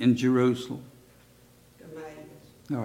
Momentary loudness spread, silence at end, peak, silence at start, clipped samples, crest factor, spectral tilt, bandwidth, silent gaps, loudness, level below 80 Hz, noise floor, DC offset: 24 LU; 0 s; -12 dBFS; 0 s; under 0.1%; 18 dB; -7 dB/octave; 14.5 kHz; none; -26 LUFS; -66 dBFS; -57 dBFS; under 0.1%